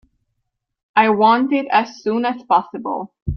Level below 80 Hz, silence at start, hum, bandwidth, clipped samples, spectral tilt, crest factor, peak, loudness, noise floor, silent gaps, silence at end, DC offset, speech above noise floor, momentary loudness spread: -46 dBFS; 0.95 s; none; 6.6 kHz; under 0.1%; -6.5 dB/octave; 16 dB; -2 dBFS; -18 LUFS; -75 dBFS; 3.22-3.26 s; 0 s; under 0.1%; 58 dB; 12 LU